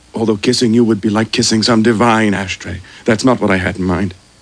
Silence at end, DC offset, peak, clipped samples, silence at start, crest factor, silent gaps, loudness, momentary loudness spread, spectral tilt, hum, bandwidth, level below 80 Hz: 0.3 s; under 0.1%; 0 dBFS; under 0.1%; 0.15 s; 14 dB; none; -14 LUFS; 10 LU; -4.5 dB/octave; none; 10.5 kHz; -44 dBFS